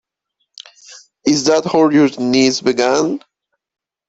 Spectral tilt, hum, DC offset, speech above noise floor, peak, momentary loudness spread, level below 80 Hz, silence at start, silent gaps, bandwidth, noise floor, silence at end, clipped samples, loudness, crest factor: -4 dB/octave; none; under 0.1%; 58 dB; 0 dBFS; 8 LU; -58 dBFS; 0.9 s; none; 8 kHz; -71 dBFS; 0.9 s; under 0.1%; -14 LUFS; 16 dB